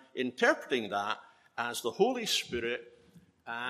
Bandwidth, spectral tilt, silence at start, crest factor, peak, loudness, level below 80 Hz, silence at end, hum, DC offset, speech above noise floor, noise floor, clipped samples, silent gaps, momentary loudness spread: 14.5 kHz; -2.5 dB/octave; 0.15 s; 20 dB; -12 dBFS; -32 LUFS; -68 dBFS; 0 s; none; under 0.1%; 29 dB; -61 dBFS; under 0.1%; none; 12 LU